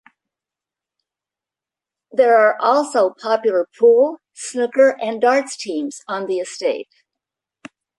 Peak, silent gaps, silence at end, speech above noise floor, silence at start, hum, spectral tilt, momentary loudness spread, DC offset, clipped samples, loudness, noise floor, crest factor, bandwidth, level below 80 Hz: -2 dBFS; none; 1.15 s; 71 dB; 2.15 s; none; -3 dB/octave; 13 LU; under 0.1%; under 0.1%; -17 LUFS; -88 dBFS; 16 dB; 11.5 kHz; -74 dBFS